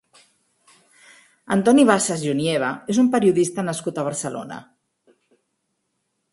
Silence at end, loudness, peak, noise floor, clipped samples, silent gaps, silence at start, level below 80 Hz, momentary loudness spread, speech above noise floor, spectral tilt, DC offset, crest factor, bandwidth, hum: 1.7 s; -20 LUFS; 0 dBFS; -74 dBFS; under 0.1%; none; 1.5 s; -64 dBFS; 14 LU; 55 dB; -5 dB/octave; under 0.1%; 22 dB; 11.5 kHz; none